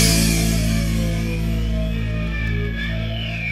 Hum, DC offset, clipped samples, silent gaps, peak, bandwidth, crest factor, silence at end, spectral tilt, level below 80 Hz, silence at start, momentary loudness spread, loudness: none; under 0.1%; under 0.1%; none; -2 dBFS; 16 kHz; 18 dB; 0 s; -4.5 dB/octave; -24 dBFS; 0 s; 7 LU; -21 LUFS